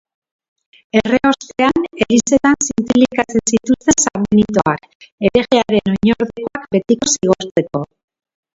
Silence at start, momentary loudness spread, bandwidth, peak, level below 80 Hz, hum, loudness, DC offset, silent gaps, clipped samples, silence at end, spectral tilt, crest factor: 0.95 s; 6 LU; 7.8 kHz; 0 dBFS; -44 dBFS; none; -15 LUFS; under 0.1%; 4.95-5.00 s, 5.12-5.18 s, 7.51-7.55 s; under 0.1%; 0.7 s; -4 dB/octave; 16 dB